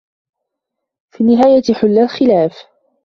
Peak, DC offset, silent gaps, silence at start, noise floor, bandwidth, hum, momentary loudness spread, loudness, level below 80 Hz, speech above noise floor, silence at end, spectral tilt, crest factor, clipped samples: 0 dBFS; under 0.1%; none; 1.2 s; -78 dBFS; 6.6 kHz; none; 6 LU; -12 LUFS; -54 dBFS; 67 dB; 0.45 s; -7 dB/octave; 14 dB; under 0.1%